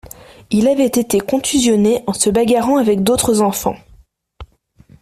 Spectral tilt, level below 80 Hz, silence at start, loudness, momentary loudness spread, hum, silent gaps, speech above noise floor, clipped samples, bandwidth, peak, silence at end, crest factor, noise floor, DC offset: -4.5 dB/octave; -44 dBFS; 0.5 s; -15 LUFS; 5 LU; none; none; 35 dB; under 0.1%; 16 kHz; -2 dBFS; 0.55 s; 14 dB; -49 dBFS; under 0.1%